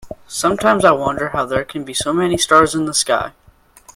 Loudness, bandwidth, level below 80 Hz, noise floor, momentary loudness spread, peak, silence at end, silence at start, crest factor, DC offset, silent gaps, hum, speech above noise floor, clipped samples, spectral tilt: -16 LUFS; 16.5 kHz; -44 dBFS; -47 dBFS; 9 LU; 0 dBFS; 0.65 s; 0.05 s; 18 dB; under 0.1%; none; none; 31 dB; under 0.1%; -3.5 dB/octave